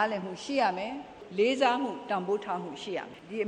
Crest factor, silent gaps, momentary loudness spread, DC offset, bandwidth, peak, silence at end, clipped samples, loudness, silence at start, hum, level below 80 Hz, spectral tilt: 18 dB; none; 12 LU; under 0.1%; 10 kHz; -12 dBFS; 0 s; under 0.1%; -31 LUFS; 0 s; none; -70 dBFS; -4.5 dB/octave